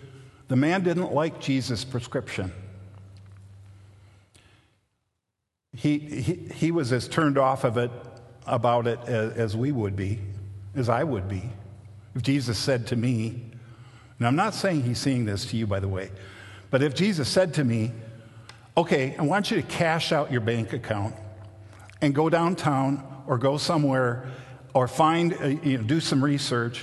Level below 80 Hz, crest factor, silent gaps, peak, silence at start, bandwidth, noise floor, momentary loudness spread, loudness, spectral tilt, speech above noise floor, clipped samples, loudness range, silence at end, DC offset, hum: -52 dBFS; 20 dB; none; -6 dBFS; 0 s; 12.5 kHz; -83 dBFS; 17 LU; -26 LUFS; -6 dB/octave; 58 dB; under 0.1%; 6 LU; 0 s; under 0.1%; none